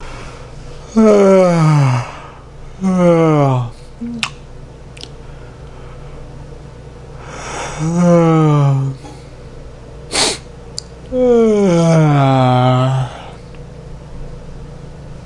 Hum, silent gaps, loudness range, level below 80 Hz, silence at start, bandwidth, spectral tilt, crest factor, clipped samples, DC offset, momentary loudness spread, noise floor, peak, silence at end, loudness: none; none; 15 LU; -36 dBFS; 0 s; 11.5 kHz; -6.5 dB/octave; 16 dB; under 0.1%; under 0.1%; 24 LU; -33 dBFS; 0 dBFS; 0 s; -13 LUFS